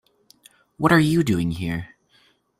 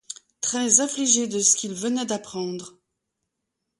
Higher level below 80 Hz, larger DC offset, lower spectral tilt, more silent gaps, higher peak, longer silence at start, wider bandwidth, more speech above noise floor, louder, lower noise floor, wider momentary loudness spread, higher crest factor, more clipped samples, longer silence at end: first, -50 dBFS vs -72 dBFS; neither; first, -6.5 dB/octave vs -2 dB/octave; neither; about the same, -2 dBFS vs -4 dBFS; first, 0.8 s vs 0.1 s; first, 15.5 kHz vs 11.5 kHz; second, 41 dB vs 57 dB; about the same, -21 LUFS vs -21 LUFS; second, -61 dBFS vs -81 dBFS; about the same, 14 LU vs 13 LU; about the same, 20 dB vs 22 dB; neither; second, 0.75 s vs 1.1 s